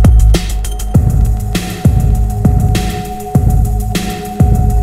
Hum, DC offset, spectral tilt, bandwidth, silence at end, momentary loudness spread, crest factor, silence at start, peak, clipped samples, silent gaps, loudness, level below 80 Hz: none; under 0.1%; -6.5 dB/octave; 15.5 kHz; 0 s; 8 LU; 10 dB; 0 s; 0 dBFS; 0.7%; none; -13 LUFS; -14 dBFS